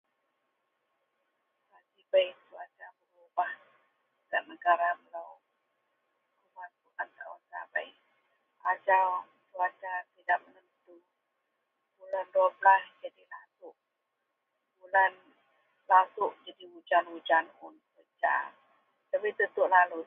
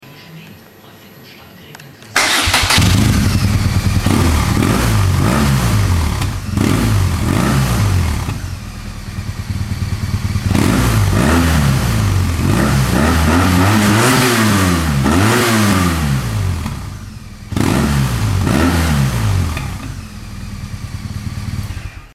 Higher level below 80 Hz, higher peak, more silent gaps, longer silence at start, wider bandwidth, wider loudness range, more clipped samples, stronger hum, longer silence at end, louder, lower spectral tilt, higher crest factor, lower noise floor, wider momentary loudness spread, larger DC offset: second, under -90 dBFS vs -24 dBFS; second, -10 dBFS vs 0 dBFS; neither; first, 2.15 s vs 0.05 s; second, 3.8 kHz vs 16 kHz; about the same, 7 LU vs 6 LU; neither; neither; about the same, 0.05 s vs 0.05 s; second, -29 LUFS vs -14 LUFS; about the same, -4.5 dB/octave vs -5 dB/octave; first, 24 dB vs 14 dB; first, -83 dBFS vs -40 dBFS; first, 24 LU vs 16 LU; neither